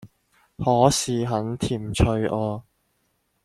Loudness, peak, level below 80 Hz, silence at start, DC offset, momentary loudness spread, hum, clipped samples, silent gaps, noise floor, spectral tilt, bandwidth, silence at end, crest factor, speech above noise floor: -23 LUFS; -2 dBFS; -40 dBFS; 0 s; under 0.1%; 9 LU; none; under 0.1%; none; -70 dBFS; -5.5 dB/octave; 14.5 kHz; 0.85 s; 22 dB; 48 dB